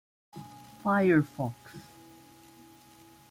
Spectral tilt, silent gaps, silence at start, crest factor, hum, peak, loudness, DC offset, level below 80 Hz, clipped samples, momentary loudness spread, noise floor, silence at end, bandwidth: -7.5 dB/octave; none; 0.35 s; 18 dB; none; -14 dBFS; -28 LUFS; under 0.1%; -68 dBFS; under 0.1%; 25 LU; -56 dBFS; 1.5 s; 16 kHz